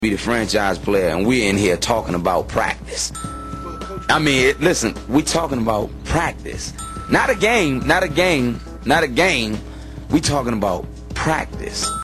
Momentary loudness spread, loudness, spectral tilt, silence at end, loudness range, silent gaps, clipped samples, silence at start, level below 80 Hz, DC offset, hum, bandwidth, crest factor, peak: 13 LU; -19 LUFS; -4 dB/octave; 0 s; 2 LU; none; under 0.1%; 0 s; -34 dBFS; under 0.1%; none; 13 kHz; 16 dB; -4 dBFS